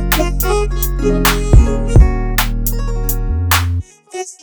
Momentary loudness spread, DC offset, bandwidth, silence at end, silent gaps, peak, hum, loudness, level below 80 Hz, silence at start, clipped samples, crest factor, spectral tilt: 9 LU; under 0.1%; over 20 kHz; 0.1 s; none; 0 dBFS; none; -15 LUFS; -16 dBFS; 0 s; under 0.1%; 14 dB; -5 dB/octave